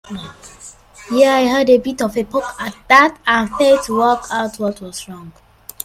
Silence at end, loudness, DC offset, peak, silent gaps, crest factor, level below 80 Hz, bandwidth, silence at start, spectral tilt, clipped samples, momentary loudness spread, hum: 0.55 s; -15 LUFS; under 0.1%; 0 dBFS; none; 16 dB; -48 dBFS; 15.5 kHz; 0.1 s; -4 dB/octave; under 0.1%; 21 LU; none